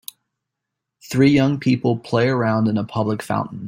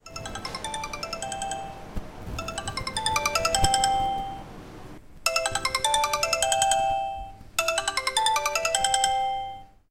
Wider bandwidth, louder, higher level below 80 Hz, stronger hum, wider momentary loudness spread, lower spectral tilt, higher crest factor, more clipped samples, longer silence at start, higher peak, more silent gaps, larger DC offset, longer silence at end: about the same, 16.5 kHz vs 17 kHz; first, -19 LUFS vs -25 LUFS; second, -56 dBFS vs -44 dBFS; neither; second, 9 LU vs 16 LU; first, -7 dB/octave vs -1 dB/octave; second, 16 dB vs 22 dB; neither; first, 1.05 s vs 0.05 s; about the same, -4 dBFS vs -6 dBFS; neither; neither; second, 0 s vs 0.25 s